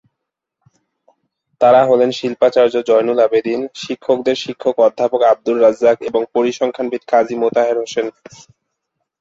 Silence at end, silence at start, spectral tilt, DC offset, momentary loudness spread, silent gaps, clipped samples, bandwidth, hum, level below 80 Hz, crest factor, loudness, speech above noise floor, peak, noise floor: 1.1 s; 1.6 s; -5 dB/octave; under 0.1%; 10 LU; none; under 0.1%; 7.8 kHz; none; -62 dBFS; 14 dB; -15 LUFS; 64 dB; -2 dBFS; -79 dBFS